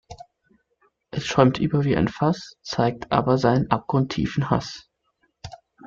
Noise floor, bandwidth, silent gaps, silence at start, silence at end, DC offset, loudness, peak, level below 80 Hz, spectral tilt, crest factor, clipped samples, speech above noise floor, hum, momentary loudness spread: -70 dBFS; 7.6 kHz; none; 0.1 s; 0 s; under 0.1%; -22 LUFS; -2 dBFS; -48 dBFS; -7 dB/octave; 22 dB; under 0.1%; 48 dB; none; 20 LU